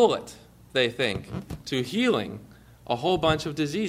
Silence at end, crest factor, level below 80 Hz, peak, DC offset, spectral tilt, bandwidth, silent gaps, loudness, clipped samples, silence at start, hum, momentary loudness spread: 0 s; 20 dB; -50 dBFS; -6 dBFS; under 0.1%; -5 dB/octave; 15.5 kHz; none; -26 LUFS; under 0.1%; 0 s; none; 13 LU